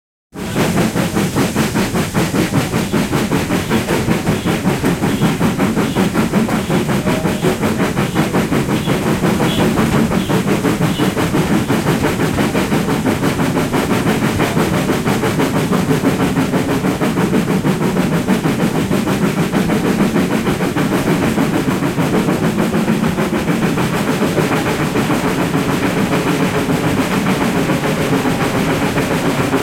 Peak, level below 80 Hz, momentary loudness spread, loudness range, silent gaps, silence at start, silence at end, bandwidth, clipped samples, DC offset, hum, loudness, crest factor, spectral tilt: -2 dBFS; -36 dBFS; 2 LU; 1 LU; none; 0.35 s; 0 s; 16.5 kHz; under 0.1%; under 0.1%; none; -16 LUFS; 14 dB; -5.5 dB/octave